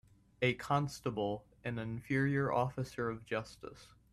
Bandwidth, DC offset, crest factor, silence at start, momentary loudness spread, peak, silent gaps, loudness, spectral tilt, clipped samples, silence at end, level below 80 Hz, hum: 13 kHz; under 0.1%; 20 dB; 0.4 s; 10 LU; -18 dBFS; none; -36 LUFS; -6.5 dB/octave; under 0.1%; 0.25 s; -64 dBFS; none